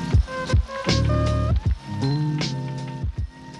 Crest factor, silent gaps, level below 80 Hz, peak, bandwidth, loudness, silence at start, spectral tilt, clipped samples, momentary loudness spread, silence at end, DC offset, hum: 18 dB; none; -28 dBFS; -6 dBFS; 10.5 kHz; -24 LUFS; 0 s; -6 dB/octave; under 0.1%; 9 LU; 0 s; under 0.1%; none